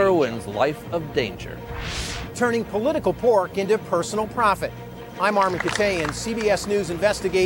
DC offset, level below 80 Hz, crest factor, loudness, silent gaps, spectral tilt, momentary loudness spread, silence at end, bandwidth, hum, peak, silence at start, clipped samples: under 0.1%; -44 dBFS; 16 dB; -23 LUFS; none; -4.5 dB/octave; 10 LU; 0 s; over 20 kHz; none; -6 dBFS; 0 s; under 0.1%